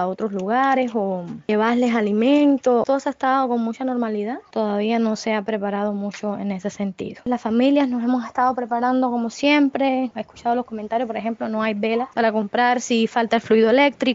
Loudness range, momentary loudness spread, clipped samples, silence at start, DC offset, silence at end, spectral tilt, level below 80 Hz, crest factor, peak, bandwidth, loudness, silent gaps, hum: 4 LU; 9 LU; under 0.1%; 0 s; under 0.1%; 0 s; -5.5 dB/octave; -64 dBFS; 16 dB; -4 dBFS; 7.8 kHz; -21 LUFS; none; none